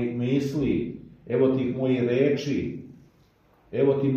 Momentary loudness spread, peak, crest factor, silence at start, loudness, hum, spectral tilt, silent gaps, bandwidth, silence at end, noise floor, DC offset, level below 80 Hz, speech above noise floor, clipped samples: 12 LU; -10 dBFS; 16 dB; 0 s; -25 LUFS; none; -8 dB/octave; none; 8.2 kHz; 0 s; -60 dBFS; under 0.1%; -54 dBFS; 36 dB; under 0.1%